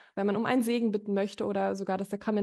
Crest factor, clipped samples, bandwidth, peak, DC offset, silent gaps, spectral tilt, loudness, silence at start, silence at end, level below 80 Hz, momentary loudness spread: 14 dB; under 0.1%; 12.5 kHz; -14 dBFS; under 0.1%; none; -6 dB/octave; -30 LUFS; 0.15 s; 0 s; -72 dBFS; 5 LU